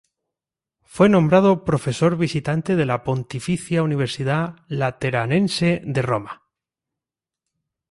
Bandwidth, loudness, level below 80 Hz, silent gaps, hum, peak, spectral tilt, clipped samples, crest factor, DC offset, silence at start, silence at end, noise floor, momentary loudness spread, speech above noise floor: 11.5 kHz; -20 LUFS; -52 dBFS; none; none; -4 dBFS; -6.5 dB/octave; under 0.1%; 18 dB; under 0.1%; 0.95 s; 1.6 s; -88 dBFS; 10 LU; 69 dB